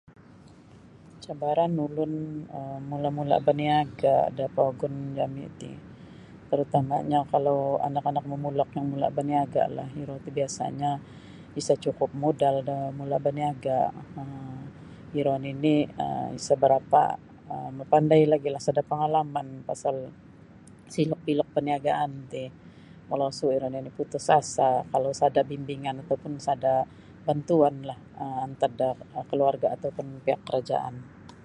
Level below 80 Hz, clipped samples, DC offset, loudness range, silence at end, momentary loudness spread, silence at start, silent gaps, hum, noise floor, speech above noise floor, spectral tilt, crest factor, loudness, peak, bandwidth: -62 dBFS; under 0.1%; under 0.1%; 5 LU; 0.05 s; 15 LU; 0.75 s; none; none; -51 dBFS; 25 dB; -6.5 dB/octave; 20 dB; -27 LUFS; -6 dBFS; 11 kHz